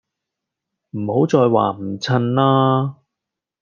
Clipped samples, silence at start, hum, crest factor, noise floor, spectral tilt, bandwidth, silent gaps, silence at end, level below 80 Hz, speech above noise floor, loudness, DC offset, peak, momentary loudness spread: under 0.1%; 0.95 s; none; 18 dB; -84 dBFS; -7.5 dB/octave; 7.2 kHz; none; 0.7 s; -64 dBFS; 67 dB; -18 LUFS; under 0.1%; 0 dBFS; 12 LU